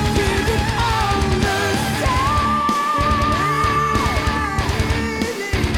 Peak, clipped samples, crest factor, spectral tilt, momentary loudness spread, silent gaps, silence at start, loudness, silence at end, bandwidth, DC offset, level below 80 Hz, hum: -8 dBFS; under 0.1%; 10 dB; -5 dB/octave; 3 LU; none; 0 s; -18 LUFS; 0 s; 18 kHz; under 0.1%; -26 dBFS; none